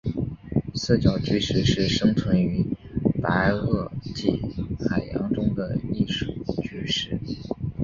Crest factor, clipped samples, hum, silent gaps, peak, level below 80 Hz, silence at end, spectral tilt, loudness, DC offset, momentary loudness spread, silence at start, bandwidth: 18 dB; under 0.1%; none; none; -6 dBFS; -40 dBFS; 0 s; -6 dB/octave; -25 LUFS; under 0.1%; 9 LU; 0.05 s; 7.6 kHz